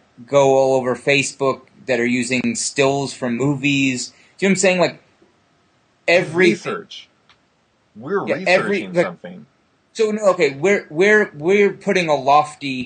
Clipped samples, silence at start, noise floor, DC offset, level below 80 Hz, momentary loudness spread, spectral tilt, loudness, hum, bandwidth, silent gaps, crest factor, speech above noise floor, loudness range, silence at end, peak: under 0.1%; 0.2 s; -61 dBFS; under 0.1%; -64 dBFS; 11 LU; -4.5 dB/octave; -17 LUFS; none; 10 kHz; none; 16 dB; 44 dB; 4 LU; 0 s; -2 dBFS